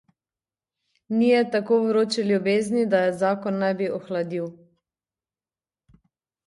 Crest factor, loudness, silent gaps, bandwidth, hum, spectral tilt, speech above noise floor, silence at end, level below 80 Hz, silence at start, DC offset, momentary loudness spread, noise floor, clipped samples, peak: 16 dB; -23 LUFS; none; 11.5 kHz; none; -6 dB/octave; over 68 dB; 1.95 s; -72 dBFS; 1.1 s; under 0.1%; 8 LU; under -90 dBFS; under 0.1%; -8 dBFS